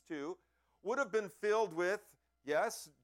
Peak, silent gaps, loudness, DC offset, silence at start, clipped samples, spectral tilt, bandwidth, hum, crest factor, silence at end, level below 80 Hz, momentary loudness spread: -22 dBFS; none; -37 LUFS; under 0.1%; 0.1 s; under 0.1%; -3.5 dB/octave; 16.5 kHz; none; 16 dB; 0.15 s; -82 dBFS; 13 LU